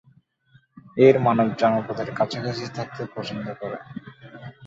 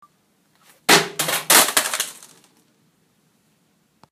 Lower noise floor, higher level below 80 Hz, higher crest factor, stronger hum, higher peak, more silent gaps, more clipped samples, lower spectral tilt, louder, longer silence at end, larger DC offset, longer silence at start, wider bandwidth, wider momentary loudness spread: second, -59 dBFS vs -63 dBFS; first, -62 dBFS vs -72 dBFS; about the same, 22 dB vs 22 dB; neither; about the same, -2 dBFS vs 0 dBFS; neither; neither; first, -7 dB/octave vs -0.5 dB/octave; second, -23 LUFS vs -16 LUFS; second, 0 s vs 2 s; neither; second, 0.75 s vs 0.9 s; second, 7.6 kHz vs 15.5 kHz; first, 23 LU vs 13 LU